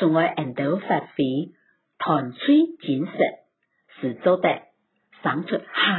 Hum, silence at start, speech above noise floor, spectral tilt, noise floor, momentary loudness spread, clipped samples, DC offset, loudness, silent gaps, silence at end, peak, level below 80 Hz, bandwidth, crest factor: none; 0 s; 39 dB; -10.5 dB/octave; -62 dBFS; 10 LU; under 0.1%; under 0.1%; -23 LUFS; none; 0 s; -4 dBFS; -74 dBFS; 4.3 kHz; 18 dB